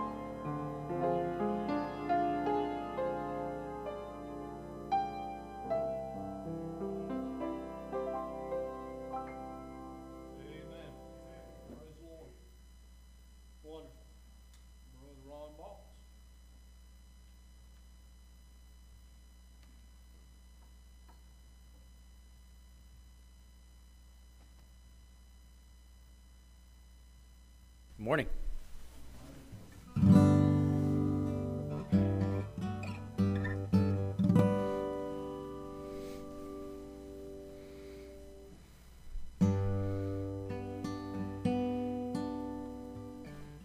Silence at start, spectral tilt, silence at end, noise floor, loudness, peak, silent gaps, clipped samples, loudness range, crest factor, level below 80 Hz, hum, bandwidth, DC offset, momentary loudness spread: 0 s; -8.5 dB/octave; 0 s; -58 dBFS; -35 LUFS; -10 dBFS; none; under 0.1%; 24 LU; 26 dB; -52 dBFS; none; 13.5 kHz; under 0.1%; 22 LU